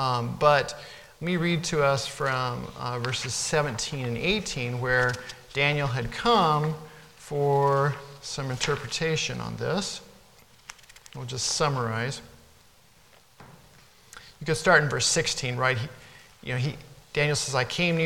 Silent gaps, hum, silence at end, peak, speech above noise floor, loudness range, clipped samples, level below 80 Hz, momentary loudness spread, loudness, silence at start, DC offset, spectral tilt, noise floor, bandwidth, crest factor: none; none; 0 s; -4 dBFS; 32 dB; 6 LU; under 0.1%; -52 dBFS; 18 LU; -26 LUFS; 0 s; under 0.1%; -4 dB/octave; -58 dBFS; 17 kHz; 22 dB